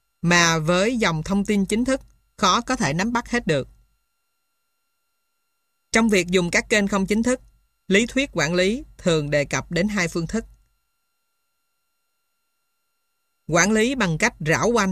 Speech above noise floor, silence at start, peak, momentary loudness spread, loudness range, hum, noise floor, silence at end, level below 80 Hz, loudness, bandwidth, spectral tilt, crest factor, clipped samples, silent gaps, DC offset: 55 dB; 0.25 s; -4 dBFS; 6 LU; 8 LU; none; -76 dBFS; 0 s; -46 dBFS; -21 LUFS; 14 kHz; -4 dB/octave; 20 dB; under 0.1%; none; under 0.1%